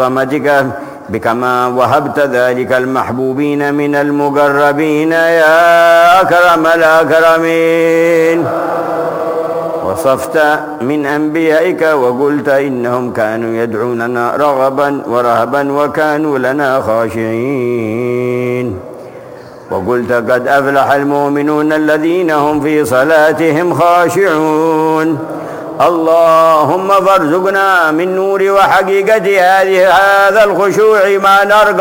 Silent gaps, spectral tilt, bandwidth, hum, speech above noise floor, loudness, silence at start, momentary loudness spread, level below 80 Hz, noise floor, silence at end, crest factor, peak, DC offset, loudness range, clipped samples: none; -5.5 dB/octave; 17 kHz; none; 21 dB; -10 LUFS; 0 s; 8 LU; -50 dBFS; -31 dBFS; 0 s; 10 dB; 0 dBFS; under 0.1%; 6 LU; under 0.1%